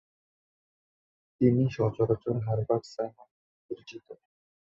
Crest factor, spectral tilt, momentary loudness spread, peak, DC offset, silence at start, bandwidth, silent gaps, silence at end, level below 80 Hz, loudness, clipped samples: 20 dB; -9 dB/octave; 18 LU; -10 dBFS; under 0.1%; 1.4 s; 7.6 kHz; 3.31-3.69 s; 0.55 s; -60 dBFS; -28 LUFS; under 0.1%